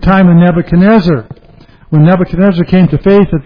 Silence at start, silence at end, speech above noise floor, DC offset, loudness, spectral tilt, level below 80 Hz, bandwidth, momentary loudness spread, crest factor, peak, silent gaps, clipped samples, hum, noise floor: 0 s; 0.05 s; 31 dB; under 0.1%; -8 LUFS; -10.5 dB/octave; -28 dBFS; 5.2 kHz; 5 LU; 8 dB; 0 dBFS; none; 0.7%; none; -38 dBFS